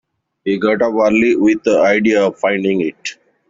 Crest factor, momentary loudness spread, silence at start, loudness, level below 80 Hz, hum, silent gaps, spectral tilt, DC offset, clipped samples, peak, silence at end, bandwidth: 14 dB; 10 LU; 0.45 s; -14 LUFS; -54 dBFS; none; none; -5.5 dB/octave; under 0.1%; under 0.1%; -2 dBFS; 0.35 s; 7.6 kHz